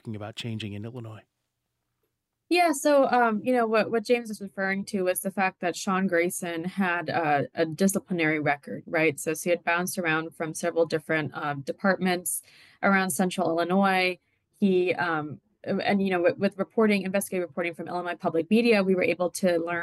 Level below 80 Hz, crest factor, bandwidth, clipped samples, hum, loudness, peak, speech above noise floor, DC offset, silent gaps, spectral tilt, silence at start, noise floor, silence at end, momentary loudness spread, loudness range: -74 dBFS; 16 dB; 13 kHz; under 0.1%; none; -26 LUFS; -10 dBFS; 55 dB; under 0.1%; none; -5 dB/octave; 0.05 s; -80 dBFS; 0 s; 10 LU; 2 LU